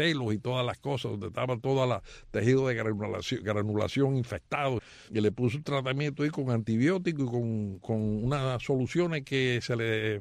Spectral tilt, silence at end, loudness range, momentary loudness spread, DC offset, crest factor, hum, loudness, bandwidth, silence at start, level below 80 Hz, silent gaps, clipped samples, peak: -6.5 dB/octave; 0 s; 1 LU; 6 LU; under 0.1%; 16 dB; none; -30 LUFS; 10.5 kHz; 0 s; -56 dBFS; none; under 0.1%; -14 dBFS